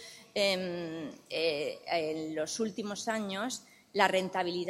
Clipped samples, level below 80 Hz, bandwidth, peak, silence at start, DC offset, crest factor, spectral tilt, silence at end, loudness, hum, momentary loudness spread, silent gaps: under 0.1%; -76 dBFS; 16 kHz; -10 dBFS; 0 s; under 0.1%; 24 dB; -3.5 dB/octave; 0 s; -33 LUFS; none; 10 LU; none